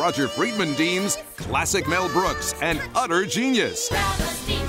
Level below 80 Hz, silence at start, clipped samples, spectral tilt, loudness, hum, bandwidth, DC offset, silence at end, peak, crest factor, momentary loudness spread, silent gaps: -38 dBFS; 0 s; under 0.1%; -3.5 dB/octave; -23 LUFS; none; 16 kHz; under 0.1%; 0 s; -10 dBFS; 14 dB; 4 LU; none